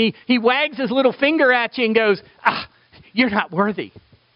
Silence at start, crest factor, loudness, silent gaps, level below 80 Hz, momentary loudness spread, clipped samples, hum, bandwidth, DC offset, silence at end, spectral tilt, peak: 0 s; 20 dB; -18 LUFS; none; -60 dBFS; 11 LU; under 0.1%; none; 5.6 kHz; under 0.1%; 0.45 s; -2.5 dB/octave; 0 dBFS